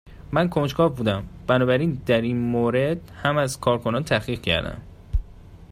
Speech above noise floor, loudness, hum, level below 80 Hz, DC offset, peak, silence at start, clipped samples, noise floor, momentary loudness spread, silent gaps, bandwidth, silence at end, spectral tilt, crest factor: 22 dB; -23 LUFS; none; -38 dBFS; under 0.1%; -6 dBFS; 0.05 s; under 0.1%; -44 dBFS; 10 LU; none; 15.5 kHz; 0.05 s; -6 dB/octave; 18 dB